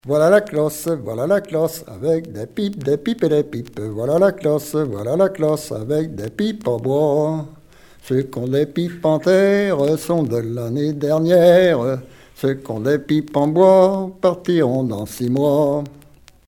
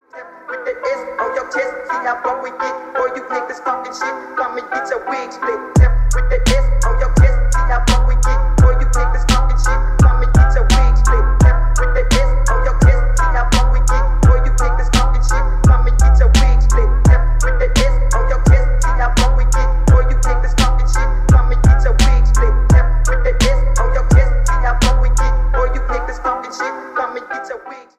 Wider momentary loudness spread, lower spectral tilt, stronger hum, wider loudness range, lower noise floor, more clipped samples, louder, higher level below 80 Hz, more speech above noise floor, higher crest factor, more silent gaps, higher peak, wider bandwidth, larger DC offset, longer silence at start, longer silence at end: about the same, 10 LU vs 9 LU; first, -7 dB/octave vs -5.5 dB/octave; neither; about the same, 5 LU vs 7 LU; first, -47 dBFS vs -35 dBFS; neither; about the same, -18 LUFS vs -16 LUFS; second, -54 dBFS vs -12 dBFS; first, 29 dB vs 20 dB; first, 18 dB vs 12 dB; neither; about the same, 0 dBFS vs 0 dBFS; first, 17.5 kHz vs 11 kHz; neither; about the same, 0.05 s vs 0.15 s; first, 0.6 s vs 0.2 s